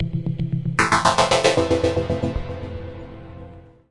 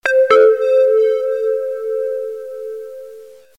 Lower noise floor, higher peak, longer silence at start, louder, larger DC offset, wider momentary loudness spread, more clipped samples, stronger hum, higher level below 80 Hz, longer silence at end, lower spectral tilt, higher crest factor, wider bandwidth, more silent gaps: about the same, -42 dBFS vs -39 dBFS; first, 0 dBFS vs -4 dBFS; about the same, 0 s vs 0.05 s; second, -20 LUFS vs -15 LUFS; second, under 0.1% vs 0.3%; first, 22 LU vs 18 LU; neither; neither; first, -40 dBFS vs -70 dBFS; about the same, 0.25 s vs 0.25 s; first, -4.5 dB/octave vs -2.5 dB/octave; first, 20 dB vs 12 dB; first, 11.5 kHz vs 9.4 kHz; neither